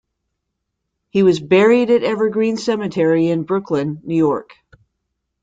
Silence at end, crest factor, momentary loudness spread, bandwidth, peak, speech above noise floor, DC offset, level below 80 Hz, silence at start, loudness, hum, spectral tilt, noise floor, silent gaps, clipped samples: 1 s; 16 dB; 9 LU; 9 kHz; -2 dBFS; 60 dB; under 0.1%; -60 dBFS; 1.15 s; -17 LUFS; none; -7 dB/octave; -76 dBFS; none; under 0.1%